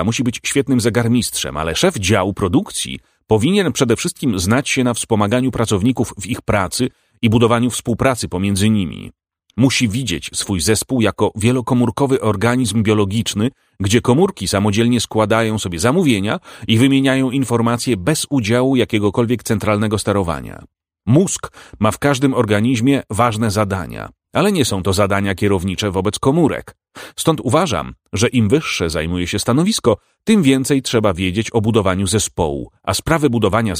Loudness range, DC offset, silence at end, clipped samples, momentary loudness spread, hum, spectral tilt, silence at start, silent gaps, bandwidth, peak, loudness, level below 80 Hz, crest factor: 2 LU; under 0.1%; 0 s; under 0.1%; 7 LU; none; -5 dB/octave; 0 s; none; 16 kHz; 0 dBFS; -17 LUFS; -42 dBFS; 16 dB